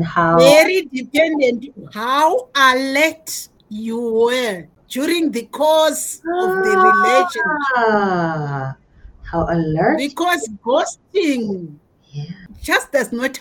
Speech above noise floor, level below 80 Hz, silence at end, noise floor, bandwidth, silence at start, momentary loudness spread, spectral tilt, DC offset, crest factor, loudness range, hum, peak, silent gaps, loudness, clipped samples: 22 dB; -46 dBFS; 0 s; -38 dBFS; 18 kHz; 0 s; 17 LU; -4 dB/octave; under 0.1%; 18 dB; 4 LU; none; 0 dBFS; none; -16 LUFS; under 0.1%